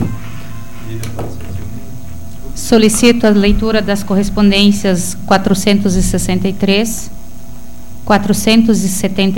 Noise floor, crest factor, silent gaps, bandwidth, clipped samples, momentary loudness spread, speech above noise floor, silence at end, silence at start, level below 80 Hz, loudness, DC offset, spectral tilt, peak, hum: -33 dBFS; 14 dB; none; 17.5 kHz; under 0.1%; 20 LU; 21 dB; 0 s; 0 s; -26 dBFS; -12 LUFS; 9%; -5 dB/octave; 0 dBFS; none